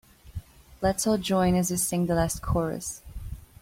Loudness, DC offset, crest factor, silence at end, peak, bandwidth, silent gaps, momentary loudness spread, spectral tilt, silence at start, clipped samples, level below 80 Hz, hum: -26 LUFS; under 0.1%; 16 dB; 0.2 s; -10 dBFS; 16.5 kHz; none; 19 LU; -5 dB/octave; 0.25 s; under 0.1%; -42 dBFS; none